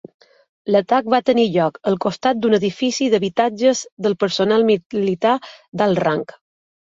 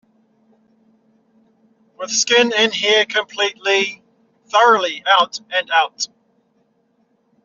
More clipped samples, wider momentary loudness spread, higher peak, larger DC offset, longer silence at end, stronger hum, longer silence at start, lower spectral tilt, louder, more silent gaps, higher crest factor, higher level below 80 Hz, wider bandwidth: neither; second, 6 LU vs 9 LU; about the same, -2 dBFS vs -2 dBFS; neither; second, 0.7 s vs 1.4 s; neither; second, 0.65 s vs 2 s; first, -5 dB/octave vs 1.5 dB/octave; about the same, -18 LUFS vs -16 LUFS; first, 3.92-3.97 s, 4.86-4.90 s, 5.68-5.72 s vs none; about the same, 16 dB vs 18 dB; first, -62 dBFS vs -72 dBFS; about the same, 7.8 kHz vs 7.6 kHz